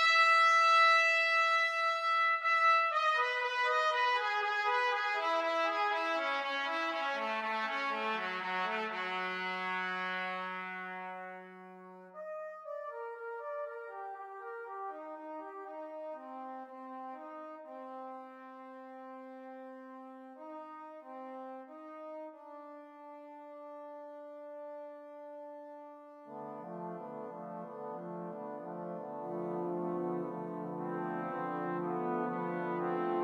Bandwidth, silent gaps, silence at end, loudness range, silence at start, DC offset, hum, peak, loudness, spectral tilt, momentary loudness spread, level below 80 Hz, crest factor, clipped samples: 13.5 kHz; none; 0 s; 19 LU; 0 s; under 0.1%; none; -16 dBFS; -32 LUFS; -4 dB/octave; 22 LU; under -90 dBFS; 20 dB; under 0.1%